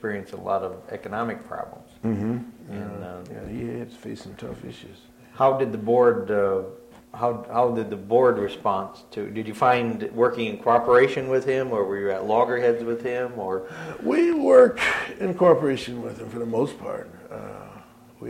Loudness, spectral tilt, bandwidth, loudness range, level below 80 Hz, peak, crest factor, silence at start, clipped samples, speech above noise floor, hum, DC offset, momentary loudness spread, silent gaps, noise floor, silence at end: -23 LUFS; -6.5 dB/octave; 12.5 kHz; 11 LU; -58 dBFS; -4 dBFS; 20 dB; 0.05 s; under 0.1%; 24 dB; none; under 0.1%; 19 LU; none; -47 dBFS; 0 s